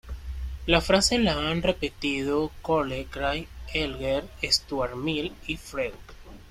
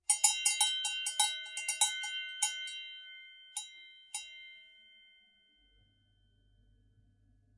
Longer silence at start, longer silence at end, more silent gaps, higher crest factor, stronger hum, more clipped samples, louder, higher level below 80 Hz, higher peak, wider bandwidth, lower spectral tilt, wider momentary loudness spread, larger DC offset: about the same, 0.05 s vs 0.1 s; second, 0 s vs 2.9 s; neither; second, 22 dB vs 28 dB; neither; neither; first, -26 LUFS vs -32 LUFS; first, -40 dBFS vs -76 dBFS; first, -4 dBFS vs -10 dBFS; first, 16 kHz vs 11.5 kHz; first, -4 dB/octave vs 5 dB/octave; second, 12 LU vs 22 LU; neither